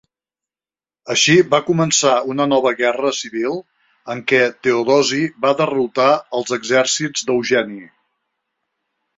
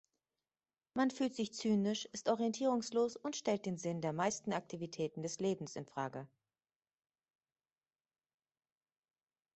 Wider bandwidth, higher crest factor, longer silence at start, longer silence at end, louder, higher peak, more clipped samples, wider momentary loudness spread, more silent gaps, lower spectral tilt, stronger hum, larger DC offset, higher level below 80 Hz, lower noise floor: about the same, 8 kHz vs 8.2 kHz; about the same, 16 dB vs 20 dB; about the same, 1.05 s vs 0.95 s; second, 1.3 s vs 3.3 s; first, -16 LUFS vs -38 LUFS; first, -2 dBFS vs -20 dBFS; neither; about the same, 9 LU vs 9 LU; neither; second, -3.5 dB/octave vs -5 dB/octave; neither; neither; first, -62 dBFS vs -80 dBFS; about the same, under -90 dBFS vs under -90 dBFS